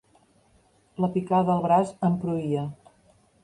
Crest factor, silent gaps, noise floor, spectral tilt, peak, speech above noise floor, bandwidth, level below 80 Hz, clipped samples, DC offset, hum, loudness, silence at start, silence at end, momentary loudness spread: 18 dB; none; -62 dBFS; -8.5 dB/octave; -10 dBFS; 38 dB; 10.5 kHz; -62 dBFS; under 0.1%; under 0.1%; none; -25 LUFS; 1 s; 0.7 s; 9 LU